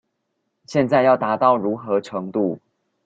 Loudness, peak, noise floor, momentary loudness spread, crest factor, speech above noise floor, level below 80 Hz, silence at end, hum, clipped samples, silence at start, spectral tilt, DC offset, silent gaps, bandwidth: -20 LUFS; -4 dBFS; -74 dBFS; 9 LU; 18 dB; 55 dB; -62 dBFS; 0.5 s; none; under 0.1%; 0.7 s; -7 dB/octave; under 0.1%; none; 7.8 kHz